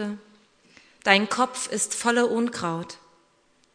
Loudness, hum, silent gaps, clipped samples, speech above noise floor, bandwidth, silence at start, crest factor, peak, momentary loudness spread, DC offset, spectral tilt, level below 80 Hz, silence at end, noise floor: -24 LUFS; none; none; under 0.1%; 39 dB; 11 kHz; 0 s; 26 dB; 0 dBFS; 18 LU; under 0.1%; -3 dB/octave; -72 dBFS; 0.8 s; -63 dBFS